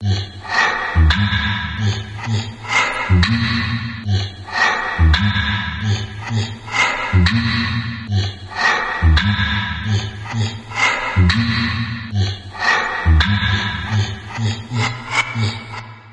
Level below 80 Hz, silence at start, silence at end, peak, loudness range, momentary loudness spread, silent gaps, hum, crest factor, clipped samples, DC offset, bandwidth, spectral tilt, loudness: -28 dBFS; 0 s; 0 s; -2 dBFS; 2 LU; 8 LU; none; none; 16 dB; under 0.1%; under 0.1%; 9.2 kHz; -5 dB/octave; -18 LUFS